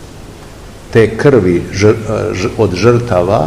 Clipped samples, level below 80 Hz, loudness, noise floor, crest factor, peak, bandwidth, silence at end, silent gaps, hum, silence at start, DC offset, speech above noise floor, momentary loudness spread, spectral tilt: 1%; -34 dBFS; -11 LUFS; -32 dBFS; 12 dB; 0 dBFS; 13 kHz; 0 s; none; none; 0 s; 0.7%; 21 dB; 8 LU; -6.5 dB/octave